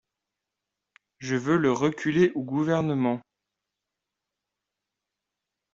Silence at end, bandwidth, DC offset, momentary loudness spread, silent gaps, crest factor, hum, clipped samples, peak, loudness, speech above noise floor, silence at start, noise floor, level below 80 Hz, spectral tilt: 2.55 s; 7.6 kHz; under 0.1%; 7 LU; none; 18 dB; none; under 0.1%; -10 dBFS; -25 LUFS; 62 dB; 1.2 s; -86 dBFS; -66 dBFS; -6.5 dB/octave